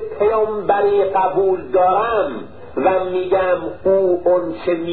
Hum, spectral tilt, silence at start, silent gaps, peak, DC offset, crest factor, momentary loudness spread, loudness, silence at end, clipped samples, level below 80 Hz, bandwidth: none; -11 dB/octave; 0 s; none; -4 dBFS; 1%; 14 dB; 6 LU; -17 LUFS; 0 s; under 0.1%; -48 dBFS; 4.6 kHz